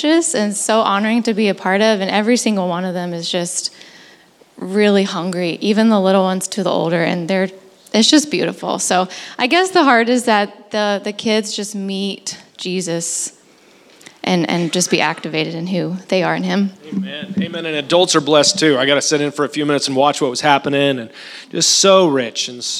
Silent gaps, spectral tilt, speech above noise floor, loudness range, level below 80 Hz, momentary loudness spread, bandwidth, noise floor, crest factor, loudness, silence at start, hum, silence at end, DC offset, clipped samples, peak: none; -3.5 dB/octave; 32 dB; 5 LU; -70 dBFS; 11 LU; 15 kHz; -48 dBFS; 16 dB; -16 LUFS; 0 s; none; 0 s; under 0.1%; under 0.1%; 0 dBFS